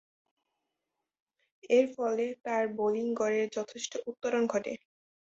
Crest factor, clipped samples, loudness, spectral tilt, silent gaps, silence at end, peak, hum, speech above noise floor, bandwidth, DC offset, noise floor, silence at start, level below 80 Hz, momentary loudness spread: 18 dB; under 0.1%; -31 LUFS; -4 dB/octave; none; 0.45 s; -14 dBFS; none; 56 dB; 8 kHz; under 0.1%; -87 dBFS; 1.65 s; -78 dBFS; 10 LU